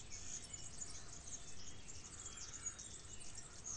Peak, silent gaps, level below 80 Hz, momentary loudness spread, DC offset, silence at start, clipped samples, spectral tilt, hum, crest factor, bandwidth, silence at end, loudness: -34 dBFS; none; -62 dBFS; 6 LU; under 0.1%; 0 s; under 0.1%; -1.5 dB/octave; none; 14 dB; 10 kHz; 0 s; -50 LUFS